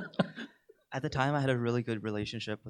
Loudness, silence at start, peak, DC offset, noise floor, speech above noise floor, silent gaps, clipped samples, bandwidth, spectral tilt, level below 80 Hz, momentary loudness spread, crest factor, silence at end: -33 LUFS; 0 s; -12 dBFS; under 0.1%; -53 dBFS; 21 dB; none; under 0.1%; 10.5 kHz; -6.5 dB/octave; -62 dBFS; 12 LU; 22 dB; 0 s